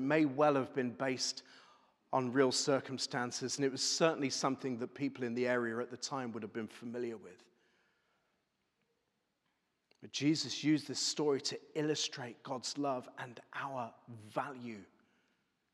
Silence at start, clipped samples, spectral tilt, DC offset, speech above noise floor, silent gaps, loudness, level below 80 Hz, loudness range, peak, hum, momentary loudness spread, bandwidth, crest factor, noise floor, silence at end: 0 s; under 0.1%; -3.5 dB/octave; under 0.1%; 46 dB; none; -36 LUFS; under -90 dBFS; 11 LU; -14 dBFS; none; 13 LU; 13 kHz; 24 dB; -83 dBFS; 0.9 s